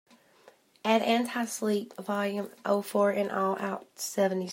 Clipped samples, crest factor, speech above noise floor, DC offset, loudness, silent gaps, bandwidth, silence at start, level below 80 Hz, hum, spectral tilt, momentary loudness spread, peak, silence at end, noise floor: under 0.1%; 20 dB; 31 dB; under 0.1%; -29 LUFS; none; 16 kHz; 0.85 s; -82 dBFS; none; -4.5 dB/octave; 9 LU; -10 dBFS; 0 s; -60 dBFS